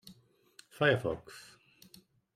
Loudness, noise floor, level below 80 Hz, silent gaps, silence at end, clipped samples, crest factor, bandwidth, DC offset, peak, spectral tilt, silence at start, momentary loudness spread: -31 LUFS; -62 dBFS; -66 dBFS; none; 0.95 s; under 0.1%; 24 dB; 15.5 kHz; under 0.1%; -12 dBFS; -5.5 dB/octave; 0.05 s; 23 LU